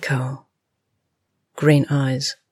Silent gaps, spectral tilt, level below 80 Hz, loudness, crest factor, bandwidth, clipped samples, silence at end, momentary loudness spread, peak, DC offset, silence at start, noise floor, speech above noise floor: none; -6 dB/octave; -66 dBFS; -20 LUFS; 18 dB; 14 kHz; under 0.1%; 0.2 s; 12 LU; -4 dBFS; under 0.1%; 0 s; -75 dBFS; 55 dB